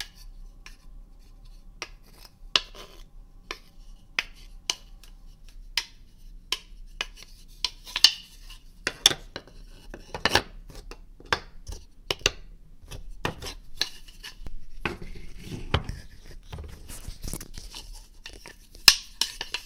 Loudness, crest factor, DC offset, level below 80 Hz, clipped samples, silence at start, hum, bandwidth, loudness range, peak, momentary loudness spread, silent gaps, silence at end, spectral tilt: -26 LUFS; 32 dB; under 0.1%; -44 dBFS; under 0.1%; 0 s; none; 17 kHz; 11 LU; 0 dBFS; 26 LU; none; 0 s; -1 dB/octave